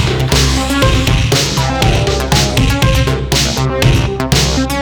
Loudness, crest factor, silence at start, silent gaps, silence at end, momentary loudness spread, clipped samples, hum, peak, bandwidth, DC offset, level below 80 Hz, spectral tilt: -12 LUFS; 12 dB; 0 s; none; 0 s; 2 LU; under 0.1%; none; 0 dBFS; over 20 kHz; under 0.1%; -18 dBFS; -4.5 dB/octave